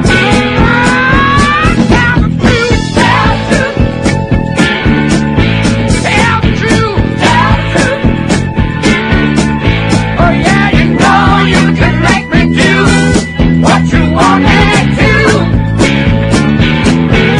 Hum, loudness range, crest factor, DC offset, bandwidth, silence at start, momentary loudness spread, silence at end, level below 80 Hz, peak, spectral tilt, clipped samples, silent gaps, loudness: none; 2 LU; 8 dB; under 0.1%; 11 kHz; 0 s; 4 LU; 0 s; -20 dBFS; 0 dBFS; -5.5 dB/octave; 1%; none; -8 LUFS